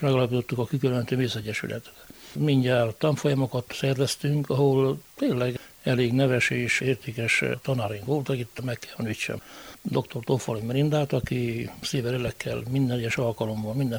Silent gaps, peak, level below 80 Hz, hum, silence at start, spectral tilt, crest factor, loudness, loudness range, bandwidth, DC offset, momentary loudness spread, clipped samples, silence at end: none; -10 dBFS; -56 dBFS; none; 0 s; -6 dB/octave; 16 dB; -26 LUFS; 4 LU; over 20 kHz; under 0.1%; 10 LU; under 0.1%; 0 s